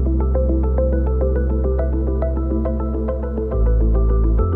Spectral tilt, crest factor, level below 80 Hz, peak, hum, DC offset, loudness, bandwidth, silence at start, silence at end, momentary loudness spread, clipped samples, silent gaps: -13 dB/octave; 12 dB; -18 dBFS; -6 dBFS; none; under 0.1%; -20 LUFS; 2.1 kHz; 0 s; 0 s; 5 LU; under 0.1%; none